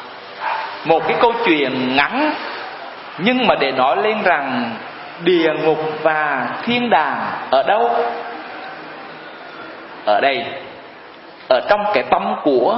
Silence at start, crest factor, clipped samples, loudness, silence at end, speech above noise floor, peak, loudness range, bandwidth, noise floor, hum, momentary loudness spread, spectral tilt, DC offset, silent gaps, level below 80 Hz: 0 s; 18 dB; under 0.1%; -17 LUFS; 0 s; 22 dB; 0 dBFS; 5 LU; 5.8 kHz; -38 dBFS; none; 18 LU; -9.5 dB/octave; under 0.1%; none; -58 dBFS